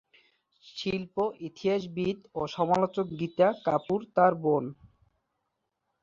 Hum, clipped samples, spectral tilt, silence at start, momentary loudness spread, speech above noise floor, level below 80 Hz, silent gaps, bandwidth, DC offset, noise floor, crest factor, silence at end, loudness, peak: none; under 0.1%; -7 dB/octave; 0.65 s; 10 LU; 53 dB; -64 dBFS; none; 7.6 kHz; under 0.1%; -81 dBFS; 20 dB; 1.3 s; -29 LUFS; -10 dBFS